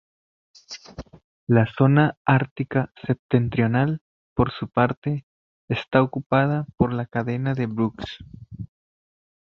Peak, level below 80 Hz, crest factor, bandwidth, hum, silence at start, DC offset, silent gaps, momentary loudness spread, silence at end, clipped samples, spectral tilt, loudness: -2 dBFS; -48 dBFS; 22 dB; 6.6 kHz; none; 0.7 s; under 0.1%; 1.24-1.47 s, 2.17-2.25 s, 2.51-2.56 s, 3.19-3.29 s, 4.01-4.36 s, 4.97-5.02 s, 5.23-5.68 s, 6.26-6.30 s; 20 LU; 0.9 s; under 0.1%; -8.5 dB/octave; -23 LUFS